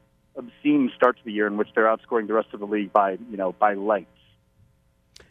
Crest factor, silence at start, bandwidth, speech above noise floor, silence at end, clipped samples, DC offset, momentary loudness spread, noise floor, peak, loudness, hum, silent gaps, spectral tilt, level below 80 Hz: 22 dB; 0.35 s; 6.4 kHz; 40 dB; 1.3 s; under 0.1%; under 0.1%; 8 LU; -63 dBFS; -4 dBFS; -23 LUFS; none; none; -7.5 dB/octave; -68 dBFS